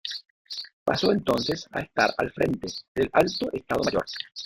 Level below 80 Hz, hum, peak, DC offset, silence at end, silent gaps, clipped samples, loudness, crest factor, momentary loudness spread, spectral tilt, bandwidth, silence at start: -54 dBFS; none; -6 dBFS; under 0.1%; 0 s; 0.30-0.45 s, 0.73-0.86 s, 2.88-2.95 s; under 0.1%; -26 LUFS; 22 dB; 11 LU; -4.5 dB/octave; 16.5 kHz; 0.05 s